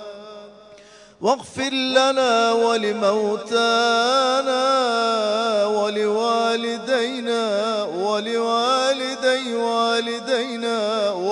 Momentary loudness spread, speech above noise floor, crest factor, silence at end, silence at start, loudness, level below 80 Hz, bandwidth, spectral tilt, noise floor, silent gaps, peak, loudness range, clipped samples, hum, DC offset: 6 LU; 27 dB; 16 dB; 0 s; 0 s; -20 LUFS; -70 dBFS; 11 kHz; -3 dB/octave; -46 dBFS; none; -4 dBFS; 3 LU; under 0.1%; none; under 0.1%